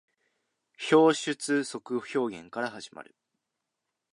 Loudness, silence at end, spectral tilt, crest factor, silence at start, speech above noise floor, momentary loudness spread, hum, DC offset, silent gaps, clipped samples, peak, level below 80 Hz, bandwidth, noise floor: -28 LUFS; 1.1 s; -4 dB/octave; 20 dB; 0.8 s; 57 dB; 16 LU; none; under 0.1%; none; under 0.1%; -10 dBFS; -80 dBFS; 11.5 kHz; -85 dBFS